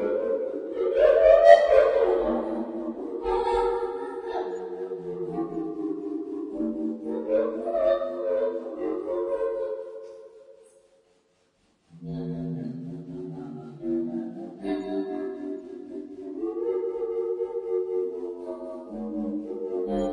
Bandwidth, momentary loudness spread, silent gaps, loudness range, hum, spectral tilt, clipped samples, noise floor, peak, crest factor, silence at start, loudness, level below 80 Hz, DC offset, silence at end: 9.6 kHz; 17 LU; none; 15 LU; none; -7 dB/octave; under 0.1%; -67 dBFS; -2 dBFS; 24 dB; 0 s; -26 LUFS; -54 dBFS; under 0.1%; 0 s